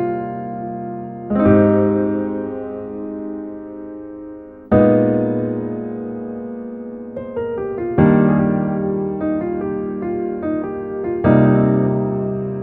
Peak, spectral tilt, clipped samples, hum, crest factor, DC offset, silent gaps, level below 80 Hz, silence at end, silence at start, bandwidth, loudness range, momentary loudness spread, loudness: -2 dBFS; -13 dB/octave; under 0.1%; none; 18 dB; under 0.1%; none; -44 dBFS; 0 s; 0 s; 3.8 kHz; 2 LU; 17 LU; -19 LUFS